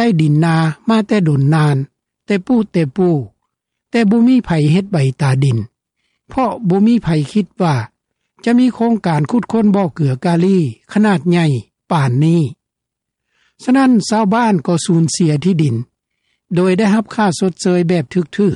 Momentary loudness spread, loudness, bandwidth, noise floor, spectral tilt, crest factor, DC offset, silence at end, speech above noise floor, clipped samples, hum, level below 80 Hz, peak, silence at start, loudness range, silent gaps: 8 LU; -14 LUFS; 11.5 kHz; -80 dBFS; -7 dB/octave; 12 dB; under 0.1%; 0 s; 66 dB; under 0.1%; none; -50 dBFS; -2 dBFS; 0 s; 2 LU; none